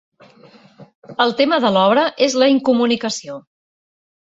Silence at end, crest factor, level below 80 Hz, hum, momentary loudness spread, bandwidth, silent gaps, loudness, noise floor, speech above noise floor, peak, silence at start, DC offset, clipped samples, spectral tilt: 0.85 s; 16 dB; -64 dBFS; none; 15 LU; 8 kHz; 0.95-1.02 s; -16 LUFS; -47 dBFS; 31 dB; -2 dBFS; 0.8 s; under 0.1%; under 0.1%; -4 dB/octave